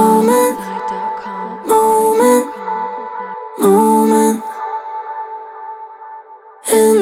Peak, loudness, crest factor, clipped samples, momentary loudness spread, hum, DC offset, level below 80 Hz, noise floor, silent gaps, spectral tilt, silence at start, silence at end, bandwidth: -2 dBFS; -15 LUFS; 14 dB; under 0.1%; 19 LU; none; under 0.1%; -60 dBFS; -37 dBFS; none; -5 dB/octave; 0 s; 0 s; 17 kHz